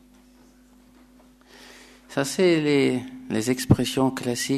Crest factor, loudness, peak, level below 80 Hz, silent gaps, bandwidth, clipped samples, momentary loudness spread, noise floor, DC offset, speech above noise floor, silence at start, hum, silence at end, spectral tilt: 24 dB; -23 LUFS; -2 dBFS; -52 dBFS; none; 13.5 kHz; under 0.1%; 9 LU; -54 dBFS; under 0.1%; 32 dB; 1.6 s; none; 0 s; -5 dB/octave